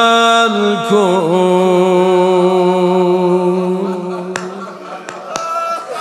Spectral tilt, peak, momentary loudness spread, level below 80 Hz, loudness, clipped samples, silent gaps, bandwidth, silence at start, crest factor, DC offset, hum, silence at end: -5.5 dB/octave; 0 dBFS; 14 LU; -66 dBFS; -13 LUFS; under 0.1%; none; 12.5 kHz; 0 s; 12 dB; under 0.1%; none; 0 s